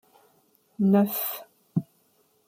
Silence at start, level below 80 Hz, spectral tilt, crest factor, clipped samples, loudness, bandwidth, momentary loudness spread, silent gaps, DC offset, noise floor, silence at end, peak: 0.8 s; -70 dBFS; -7 dB/octave; 18 dB; under 0.1%; -26 LUFS; 16 kHz; 11 LU; none; under 0.1%; -66 dBFS; 0.65 s; -10 dBFS